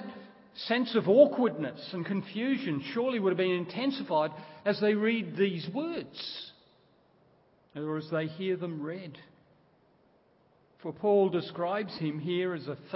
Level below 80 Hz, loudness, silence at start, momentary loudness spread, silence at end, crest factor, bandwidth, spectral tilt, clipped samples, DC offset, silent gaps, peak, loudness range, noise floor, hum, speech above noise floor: -78 dBFS; -30 LUFS; 0 s; 15 LU; 0 s; 22 dB; 5.8 kHz; -10 dB/octave; under 0.1%; under 0.1%; none; -8 dBFS; 10 LU; -66 dBFS; none; 36 dB